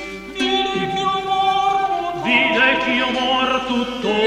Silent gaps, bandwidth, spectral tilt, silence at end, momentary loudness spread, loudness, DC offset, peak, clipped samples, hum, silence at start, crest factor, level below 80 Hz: none; 12 kHz; -3.5 dB/octave; 0 s; 7 LU; -18 LUFS; under 0.1%; -2 dBFS; under 0.1%; none; 0 s; 16 dB; -48 dBFS